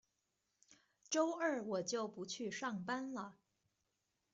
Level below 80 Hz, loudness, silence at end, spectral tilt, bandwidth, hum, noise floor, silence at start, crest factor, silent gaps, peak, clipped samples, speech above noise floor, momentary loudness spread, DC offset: -88 dBFS; -41 LUFS; 1 s; -3.5 dB/octave; 8.2 kHz; none; -86 dBFS; 0.7 s; 20 dB; none; -24 dBFS; under 0.1%; 45 dB; 9 LU; under 0.1%